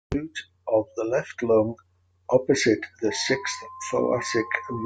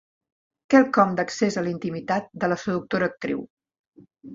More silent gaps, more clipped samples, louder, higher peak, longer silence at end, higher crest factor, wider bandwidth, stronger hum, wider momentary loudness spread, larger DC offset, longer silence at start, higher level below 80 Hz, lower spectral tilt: second, none vs 3.50-3.57 s, 3.79-3.92 s; neither; about the same, -25 LUFS vs -23 LUFS; about the same, -6 dBFS vs -4 dBFS; about the same, 0 s vs 0 s; about the same, 20 dB vs 20 dB; first, 9.4 kHz vs 7.8 kHz; neither; about the same, 11 LU vs 12 LU; neither; second, 0.1 s vs 0.7 s; first, -52 dBFS vs -64 dBFS; second, -4 dB/octave vs -6 dB/octave